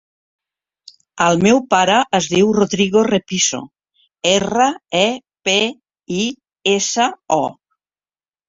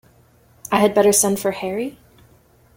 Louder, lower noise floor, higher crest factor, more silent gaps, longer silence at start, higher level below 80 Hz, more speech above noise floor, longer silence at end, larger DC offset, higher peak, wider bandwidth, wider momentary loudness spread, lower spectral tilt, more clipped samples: about the same, -16 LUFS vs -18 LUFS; first, under -90 dBFS vs -54 dBFS; about the same, 16 dB vs 18 dB; neither; first, 1.15 s vs 0.65 s; about the same, -54 dBFS vs -56 dBFS; first, over 74 dB vs 36 dB; about the same, 0.95 s vs 0.85 s; neither; about the same, -2 dBFS vs -2 dBFS; second, 8 kHz vs 17 kHz; second, 8 LU vs 15 LU; about the same, -3.5 dB/octave vs -3.5 dB/octave; neither